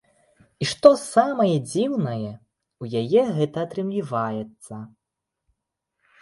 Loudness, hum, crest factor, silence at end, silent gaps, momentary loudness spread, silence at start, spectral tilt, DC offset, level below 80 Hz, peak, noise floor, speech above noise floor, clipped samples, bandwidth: -22 LUFS; none; 24 dB; 1.35 s; none; 20 LU; 0.6 s; -6 dB/octave; under 0.1%; -64 dBFS; 0 dBFS; -83 dBFS; 62 dB; under 0.1%; 11.5 kHz